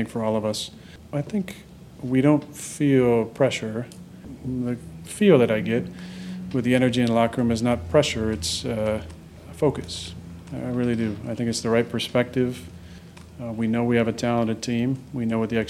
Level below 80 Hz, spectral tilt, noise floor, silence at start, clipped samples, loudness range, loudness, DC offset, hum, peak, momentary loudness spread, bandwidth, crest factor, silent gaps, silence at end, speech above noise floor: -50 dBFS; -6 dB/octave; -43 dBFS; 0 s; under 0.1%; 4 LU; -24 LUFS; under 0.1%; none; -4 dBFS; 17 LU; 14.5 kHz; 20 dB; none; 0 s; 20 dB